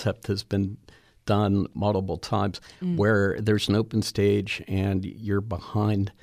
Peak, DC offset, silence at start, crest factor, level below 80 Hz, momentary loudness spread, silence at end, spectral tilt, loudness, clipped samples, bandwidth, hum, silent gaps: -10 dBFS; under 0.1%; 0 s; 14 dB; -52 dBFS; 8 LU; 0.1 s; -6.5 dB/octave; -26 LUFS; under 0.1%; 14.5 kHz; none; none